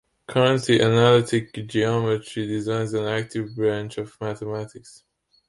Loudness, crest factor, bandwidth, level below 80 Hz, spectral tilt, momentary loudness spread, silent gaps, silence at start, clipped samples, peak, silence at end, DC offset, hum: -23 LUFS; 18 dB; 11.5 kHz; -58 dBFS; -6 dB/octave; 14 LU; none; 0.3 s; under 0.1%; -6 dBFS; 0.6 s; under 0.1%; none